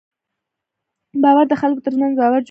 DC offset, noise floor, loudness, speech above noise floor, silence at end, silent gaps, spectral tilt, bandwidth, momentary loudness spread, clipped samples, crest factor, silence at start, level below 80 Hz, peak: under 0.1%; -80 dBFS; -16 LUFS; 66 dB; 0.05 s; none; -7 dB/octave; 5.4 kHz; 6 LU; under 0.1%; 16 dB; 1.15 s; -70 dBFS; -2 dBFS